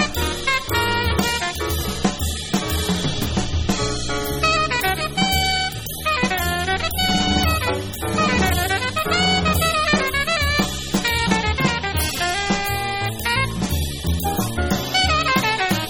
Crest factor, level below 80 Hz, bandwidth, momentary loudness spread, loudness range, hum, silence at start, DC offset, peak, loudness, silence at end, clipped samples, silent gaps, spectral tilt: 18 dB; -32 dBFS; 18 kHz; 6 LU; 3 LU; none; 0 s; under 0.1%; -2 dBFS; -20 LUFS; 0 s; under 0.1%; none; -3.5 dB/octave